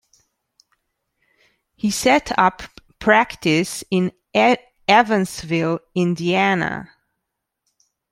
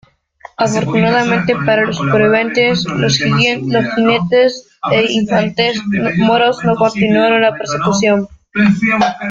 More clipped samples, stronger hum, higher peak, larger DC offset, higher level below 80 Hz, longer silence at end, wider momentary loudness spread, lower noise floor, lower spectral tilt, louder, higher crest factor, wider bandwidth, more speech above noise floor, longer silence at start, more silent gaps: neither; neither; about the same, -2 dBFS vs 0 dBFS; neither; second, -54 dBFS vs -48 dBFS; first, 1.25 s vs 0 s; first, 8 LU vs 4 LU; first, -79 dBFS vs -40 dBFS; about the same, -4.5 dB/octave vs -5 dB/octave; second, -19 LUFS vs -13 LUFS; first, 20 dB vs 12 dB; first, 15.5 kHz vs 7.8 kHz; first, 61 dB vs 27 dB; first, 1.85 s vs 0.6 s; neither